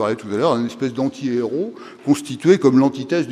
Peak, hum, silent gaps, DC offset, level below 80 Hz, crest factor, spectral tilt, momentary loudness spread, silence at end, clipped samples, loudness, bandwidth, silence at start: 0 dBFS; none; none; under 0.1%; -66 dBFS; 18 dB; -6.5 dB/octave; 10 LU; 0 s; under 0.1%; -19 LUFS; 13.5 kHz; 0 s